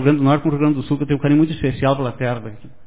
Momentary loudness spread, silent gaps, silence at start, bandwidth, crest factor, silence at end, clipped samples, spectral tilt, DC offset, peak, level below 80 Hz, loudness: 8 LU; none; 0 s; 4 kHz; 16 dB; 0.2 s; under 0.1%; -12 dB/octave; 1%; -2 dBFS; -44 dBFS; -18 LUFS